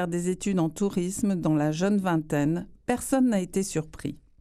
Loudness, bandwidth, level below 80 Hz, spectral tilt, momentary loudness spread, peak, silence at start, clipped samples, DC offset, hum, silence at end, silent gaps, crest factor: -27 LUFS; 14.5 kHz; -52 dBFS; -6 dB/octave; 8 LU; -10 dBFS; 0 s; under 0.1%; under 0.1%; none; 0.25 s; none; 16 dB